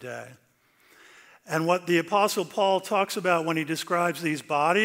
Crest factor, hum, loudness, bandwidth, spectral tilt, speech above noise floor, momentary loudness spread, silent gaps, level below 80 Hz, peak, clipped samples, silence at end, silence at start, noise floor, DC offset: 18 dB; none; -25 LUFS; 16 kHz; -4.5 dB/octave; 36 dB; 6 LU; none; -78 dBFS; -8 dBFS; under 0.1%; 0 s; 0 s; -61 dBFS; under 0.1%